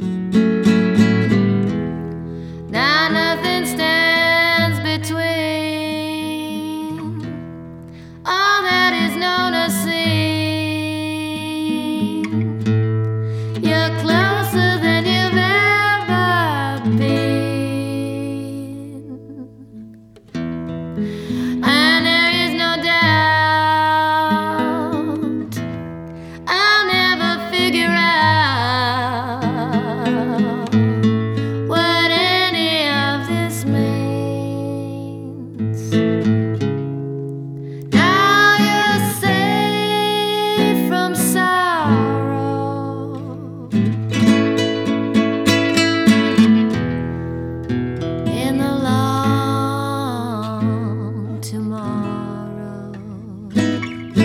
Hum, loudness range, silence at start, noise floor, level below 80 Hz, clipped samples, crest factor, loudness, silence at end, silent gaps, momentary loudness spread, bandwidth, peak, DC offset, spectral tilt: none; 7 LU; 0 s; -42 dBFS; -50 dBFS; under 0.1%; 16 dB; -17 LUFS; 0 s; none; 15 LU; 17 kHz; -2 dBFS; under 0.1%; -5 dB/octave